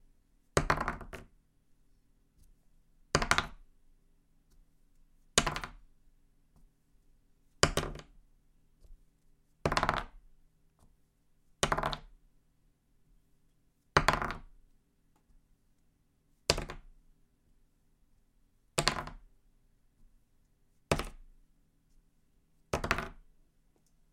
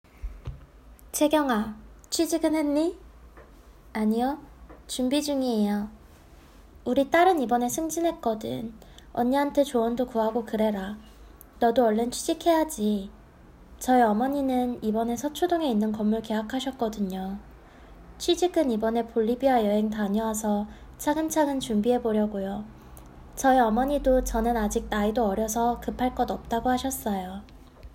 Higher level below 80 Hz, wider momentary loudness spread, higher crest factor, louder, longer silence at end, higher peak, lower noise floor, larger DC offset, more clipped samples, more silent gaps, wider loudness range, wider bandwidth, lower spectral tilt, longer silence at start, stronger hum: about the same, -50 dBFS vs -46 dBFS; first, 18 LU vs 13 LU; first, 38 dB vs 18 dB; second, -33 LUFS vs -26 LUFS; first, 0.9 s vs 0.05 s; first, -2 dBFS vs -8 dBFS; first, -71 dBFS vs -51 dBFS; neither; neither; neither; first, 6 LU vs 3 LU; about the same, 16.5 kHz vs 16.5 kHz; second, -3 dB/octave vs -5 dB/octave; first, 0.55 s vs 0.25 s; neither